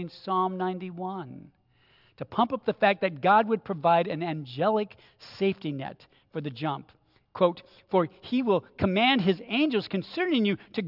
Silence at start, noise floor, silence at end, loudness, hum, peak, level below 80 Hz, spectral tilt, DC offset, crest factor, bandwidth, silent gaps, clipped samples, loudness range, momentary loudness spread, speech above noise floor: 0 s; -63 dBFS; 0 s; -27 LUFS; none; -8 dBFS; -64 dBFS; -8 dB/octave; under 0.1%; 20 dB; 5.8 kHz; none; under 0.1%; 5 LU; 15 LU; 36 dB